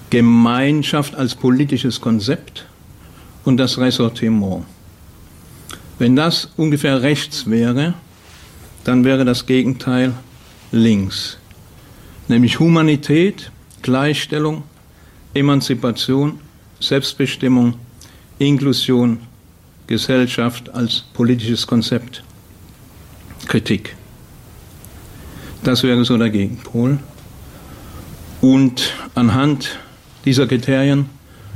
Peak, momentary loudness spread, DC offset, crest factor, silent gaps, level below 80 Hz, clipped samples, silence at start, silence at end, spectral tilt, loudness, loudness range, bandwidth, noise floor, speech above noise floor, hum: -4 dBFS; 19 LU; under 0.1%; 14 dB; none; -46 dBFS; under 0.1%; 0.1 s; 0 s; -6 dB/octave; -16 LUFS; 3 LU; 15.5 kHz; -45 dBFS; 30 dB; none